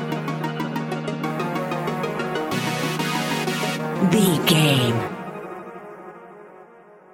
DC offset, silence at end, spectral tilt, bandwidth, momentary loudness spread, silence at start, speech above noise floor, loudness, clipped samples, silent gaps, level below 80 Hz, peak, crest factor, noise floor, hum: under 0.1%; 0.15 s; -5 dB/octave; 17 kHz; 20 LU; 0 s; 30 dB; -22 LUFS; under 0.1%; none; -62 dBFS; -4 dBFS; 20 dB; -48 dBFS; none